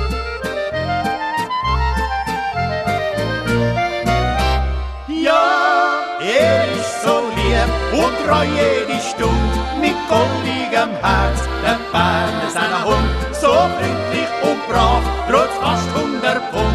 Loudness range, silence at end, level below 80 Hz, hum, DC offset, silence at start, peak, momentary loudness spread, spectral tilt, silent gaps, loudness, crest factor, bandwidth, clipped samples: 3 LU; 0 s; -26 dBFS; none; under 0.1%; 0 s; -2 dBFS; 6 LU; -5 dB/octave; none; -17 LUFS; 16 dB; 14 kHz; under 0.1%